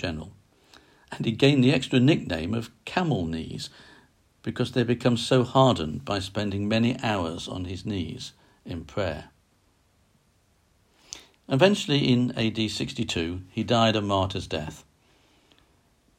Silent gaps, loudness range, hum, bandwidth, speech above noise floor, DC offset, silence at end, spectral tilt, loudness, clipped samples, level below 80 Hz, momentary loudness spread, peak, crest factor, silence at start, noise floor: none; 10 LU; none; 14 kHz; 40 dB; under 0.1%; 1.4 s; -6 dB/octave; -25 LUFS; under 0.1%; -54 dBFS; 18 LU; -6 dBFS; 20 dB; 0 s; -65 dBFS